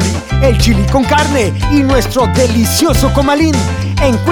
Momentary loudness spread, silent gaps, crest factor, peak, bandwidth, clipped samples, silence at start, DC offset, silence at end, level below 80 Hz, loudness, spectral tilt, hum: 3 LU; none; 10 dB; 0 dBFS; over 20 kHz; under 0.1%; 0 s; under 0.1%; 0 s; -20 dBFS; -11 LUFS; -5.5 dB/octave; none